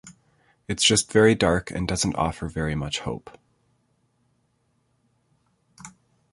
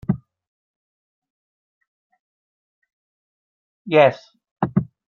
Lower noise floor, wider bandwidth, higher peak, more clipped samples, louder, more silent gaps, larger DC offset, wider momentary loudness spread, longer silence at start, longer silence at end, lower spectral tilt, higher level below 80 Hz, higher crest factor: second, -69 dBFS vs under -90 dBFS; first, 11.5 kHz vs 6.8 kHz; about the same, -4 dBFS vs -2 dBFS; neither; second, -23 LUFS vs -20 LUFS; second, none vs 0.48-1.22 s, 1.30-1.81 s, 1.87-2.10 s, 2.19-2.82 s, 2.93-3.85 s, 4.51-4.56 s; neither; first, 27 LU vs 12 LU; about the same, 0.05 s vs 0.1 s; first, 0.45 s vs 0.3 s; second, -3.5 dB/octave vs -8.5 dB/octave; first, -44 dBFS vs -56 dBFS; about the same, 22 dB vs 24 dB